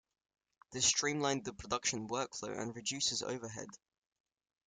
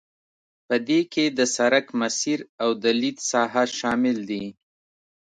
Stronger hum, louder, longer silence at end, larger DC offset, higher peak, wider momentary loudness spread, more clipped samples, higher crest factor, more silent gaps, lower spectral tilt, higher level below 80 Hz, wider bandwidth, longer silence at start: neither; second, -36 LUFS vs -23 LUFS; about the same, 0.9 s vs 0.85 s; neither; second, -18 dBFS vs -6 dBFS; first, 15 LU vs 6 LU; neither; about the same, 22 dB vs 18 dB; second, none vs 2.49-2.58 s; about the same, -2 dB/octave vs -3 dB/octave; about the same, -68 dBFS vs -68 dBFS; first, 11 kHz vs 9.4 kHz; about the same, 0.7 s vs 0.7 s